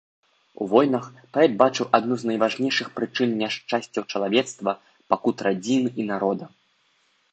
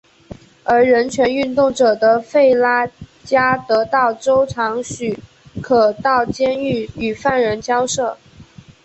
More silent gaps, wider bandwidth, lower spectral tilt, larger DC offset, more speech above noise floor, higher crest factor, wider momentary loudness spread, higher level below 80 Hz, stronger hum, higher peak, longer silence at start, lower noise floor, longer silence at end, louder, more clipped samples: neither; about the same, 8.8 kHz vs 8.4 kHz; about the same, -5 dB/octave vs -4.5 dB/octave; neither; first, 43 dB vs 26 dB; first, 22 dB vs 14 dB; about the same, 9 LU vs 11 LU; second, -70 dBFS vs -48 dBFS; neither; about the same, -2 dBFS vs -2 dBFS; first, 0.6 s vs 0.3 s; first, -65 dBFS vs -42 dBFS; first, 0.85 s vs 0.45 s; second, -23 LUFS vs -16 LUFS; neither